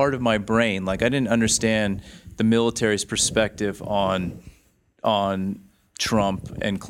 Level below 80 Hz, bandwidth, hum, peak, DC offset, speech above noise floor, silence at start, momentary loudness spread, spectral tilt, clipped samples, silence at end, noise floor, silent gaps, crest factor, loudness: -46 dBFS; 15.5 kHz; none; -4 dBFS; under 0.1%; 38 dB; 0 s; 9 LU; -4 dB/octave; under 0.1%; 0 s; -60 dBFS; none; 18 dB; -22 LUFS